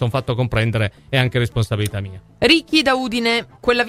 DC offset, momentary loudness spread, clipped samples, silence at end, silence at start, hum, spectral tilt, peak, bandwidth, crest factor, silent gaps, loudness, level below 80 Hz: under 0.1%; 8 LU; under 0.1%; 0 s; 0 s; none; -5.5 dB/octave; 0 dBFS; 15.5 kHz; 18 dB; none; -18 LUFS; -42 dBFS